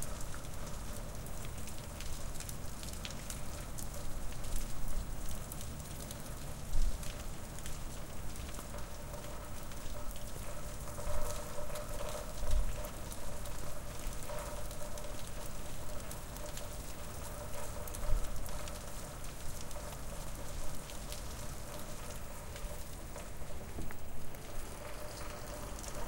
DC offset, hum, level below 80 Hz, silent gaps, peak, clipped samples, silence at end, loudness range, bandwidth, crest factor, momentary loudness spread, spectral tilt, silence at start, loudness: under 0.1%; none; -42 dBFS; none; -16 dBFS; under 0.1%; 0 s; 3 LU; 17 kHz; 20 dB; 5 LU; -4 dB/octave; 0 s; -45 LUFS